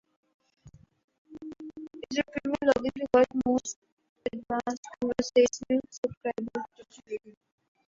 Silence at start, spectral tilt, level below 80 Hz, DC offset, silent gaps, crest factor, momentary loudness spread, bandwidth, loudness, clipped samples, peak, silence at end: 0.65 s; -4 dB/octave; -62 dBFS; under 0.1%; 1.04-1.08 s, 1.18-1.25 s, 3.76-3.82 s, 3.92-3.97 s, 4.09-4.16 s, 4.77-4.83 s, 5.98-6.03 s, 6.17-6.21 s; 20 dB; 19 LU; 7.6 kHz; -29 LUFS; under 0.1%; -10 dBFS; 0.6 s